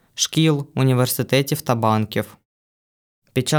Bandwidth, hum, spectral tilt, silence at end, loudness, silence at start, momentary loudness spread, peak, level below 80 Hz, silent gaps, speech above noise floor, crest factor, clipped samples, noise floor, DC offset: over 20 kHz; none; -5 dB/octave; 0 s; -20 LUFS; 0.15 s; 8 LU; -4 dBFS; -62 dBFS; 2.45-3.22 s; over 71 dB; 16 dB; under 0.1%; under -90 dBFS; under 0.1%